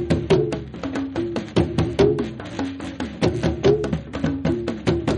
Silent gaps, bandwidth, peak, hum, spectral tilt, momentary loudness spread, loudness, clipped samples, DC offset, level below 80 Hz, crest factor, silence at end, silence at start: none; 11 kHz; -4 dBFS; none; -7 dB/octave; 10 LU; -23 LUFS; under 0.1%; under 0.1%; -38 dBFS; 18 dB; 0 s; 0 s